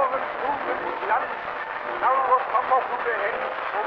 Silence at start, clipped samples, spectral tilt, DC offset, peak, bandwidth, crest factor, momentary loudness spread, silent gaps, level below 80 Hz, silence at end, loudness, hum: 0 s; under 0.1%; -5.5 dB/octave; under 0.1%; -8 dBFS; 6 kHz; 16 dB; 8 LU; none; -62 dBFS; 0 s; -24 LUFS; none